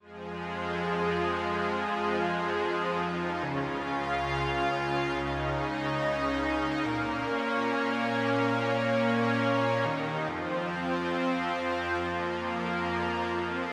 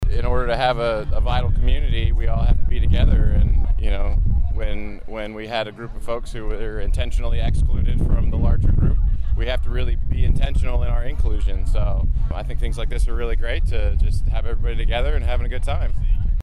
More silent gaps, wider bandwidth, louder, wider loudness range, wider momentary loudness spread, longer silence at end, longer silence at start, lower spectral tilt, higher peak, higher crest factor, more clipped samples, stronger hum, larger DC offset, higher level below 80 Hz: neither; first, 12.5 kHz vs 9.6 kHz; second, -30 LUFS vs -23 LUFS; second, 2 LU vs 5 LU; second, 5 LU vs 8 LU; about the same, 0 s vs 0 s; about the same, 0.05 s vs 0 s; about the same, -6 dB/octave vs -7 dB/octave; second, -14 dBFS vs -6 dBFS; first, 16 dB vs 10 dB; neither; neither; neither; second, -52 dBFS vs -18 dBFS